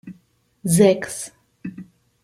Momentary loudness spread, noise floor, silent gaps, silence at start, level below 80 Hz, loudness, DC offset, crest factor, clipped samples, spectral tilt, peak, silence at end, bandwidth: 21 LU; -59 dBFS; none; 0.05 s; -62 dBFS; -19 LUFS; under 0.1%; 20 dB; under 0.1%; -5.5 dB/octave; -2 dBFS; 0.4 s; 16 kHz